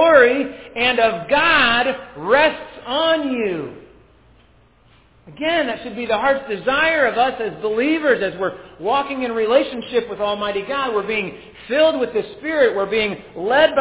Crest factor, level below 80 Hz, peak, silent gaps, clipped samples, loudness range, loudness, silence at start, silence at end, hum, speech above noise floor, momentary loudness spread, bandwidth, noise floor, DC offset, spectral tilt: 18 dB; -52 dBFS; 0 dBFS; none; under 0.1%; 6 LU; -18 LUFS; 0 s; 0 s; none; 35 dB; 10 LU; 4 kHz; -53 dBFS; under 0.1%; -7.5 dB/octave